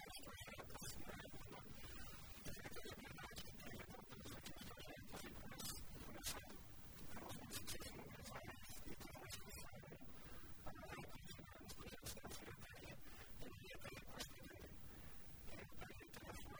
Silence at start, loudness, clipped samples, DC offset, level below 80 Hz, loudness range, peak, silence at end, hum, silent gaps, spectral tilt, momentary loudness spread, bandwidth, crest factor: 0 s; -55 LUFS; under 0.1%; under 0.1%; -64 dBFS; 4 LU; -34 dBFS; 0 s; none; none; -3.5 dB/octave; 7 LU; over 20 kHz; 20 dB